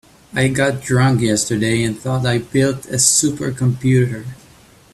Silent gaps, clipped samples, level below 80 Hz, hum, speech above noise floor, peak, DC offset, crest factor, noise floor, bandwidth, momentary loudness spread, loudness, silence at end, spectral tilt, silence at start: none; under 0.1%; -48 dBFS; none; 30 dB; 0 dBFS; under 0.1%; 18 dB; -47 dBFS; 13.5 kHz; 7 LU; -16 LUFS; 0.6 s; -4.5 dB/octave; 0.35 s